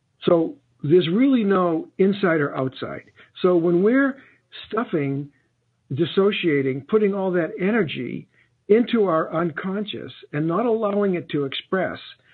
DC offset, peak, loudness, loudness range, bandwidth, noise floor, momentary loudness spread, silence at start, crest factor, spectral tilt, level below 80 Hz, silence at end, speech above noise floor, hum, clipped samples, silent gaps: under 0.1%; -6 dBFS; -22 LUFS; 3 LU; 4.5 kHz; -67 dBFS; 14 LU; 0.2 s; 16 dB; -10 dB/octave; -66 dBFS; 0.2 s; 46 dB; none; under 0.1%; none